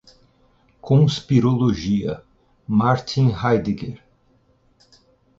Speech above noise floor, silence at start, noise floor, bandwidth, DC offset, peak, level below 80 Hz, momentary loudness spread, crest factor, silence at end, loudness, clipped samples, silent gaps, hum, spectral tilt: 41 dB; 0.85 s; -60 dBFS; 7.6 kHz; under 0.1%; -4 dBFS; -48 dBFS; 12 LU; 18 dB; 1.45 s; -20 LUFS; under 0.1%; none; none; -7.5 dB/octave